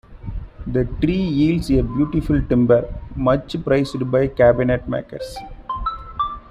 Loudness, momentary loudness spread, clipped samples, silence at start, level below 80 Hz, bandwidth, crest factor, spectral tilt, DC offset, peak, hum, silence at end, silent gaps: -19 LUFS; 16 LU; under 0.1%; 0.1 s; -32 dBFS; 13 kHz; 16 dB; -8 dB/octave; under 0.1%; -4 dBFS; none; 0.1 s; none